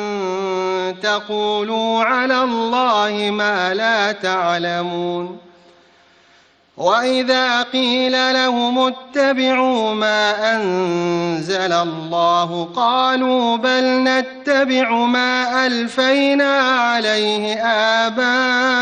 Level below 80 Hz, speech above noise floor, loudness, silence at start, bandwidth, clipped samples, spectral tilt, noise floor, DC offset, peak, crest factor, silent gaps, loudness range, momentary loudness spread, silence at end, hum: -64 dBFS; 36 dB; -17 LUFS; 0 s; 9.4 kHz; under 0.1%; -4 dB/octave; -53 dBFS; under 0.1%; -2 dBFS; 14 dB; none; 4 LU; 5 LU; 0 s; none